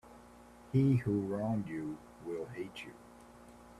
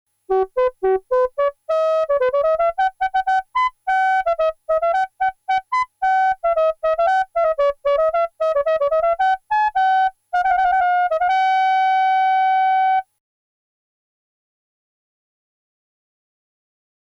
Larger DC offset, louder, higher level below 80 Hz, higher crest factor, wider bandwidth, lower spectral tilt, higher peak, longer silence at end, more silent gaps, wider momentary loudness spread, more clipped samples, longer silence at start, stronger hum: neither; second, -35 LUFS vs -19 LUFS; second, -64 dBFS vs -52 dBFS; first, 18 dB vs 12 dB; first, 12.5 kHz vs 8 kHz; first, -8.5 dB/octave vs -3.5 dB/octave; second, -18 dBFS vs -8 dBFS; second, 0 s vs 4.2 s; neither; first, 26 LU vs 4 LU; neither; second, 0.05 s vs 0.3 s; neither